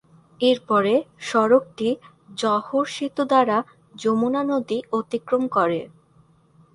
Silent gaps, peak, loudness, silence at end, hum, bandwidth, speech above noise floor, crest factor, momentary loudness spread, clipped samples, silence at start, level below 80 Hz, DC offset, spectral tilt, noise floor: none; -4 dBFS; -22 LUFS; 0.9 s; none; 11 kHz; 36 dB; 18 dB; 8 LU; under 0.1%; 0.4 s; -66 dBFS; under 0.1%; -5 dB/octave; -57 dBFS